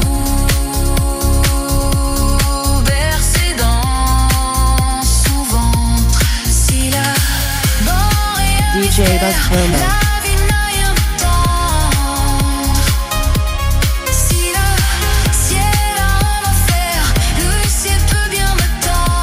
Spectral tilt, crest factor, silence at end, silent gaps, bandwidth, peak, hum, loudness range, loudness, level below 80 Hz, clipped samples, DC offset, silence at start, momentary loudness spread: -3.5 dB/octave; 12 dB; 0 s; none; 16 kHz; 0 dBFS; none; 1 LU; -14 LUFS; -16 dBFS; under 0.1%; under 0.1%; 0 s; 3 LU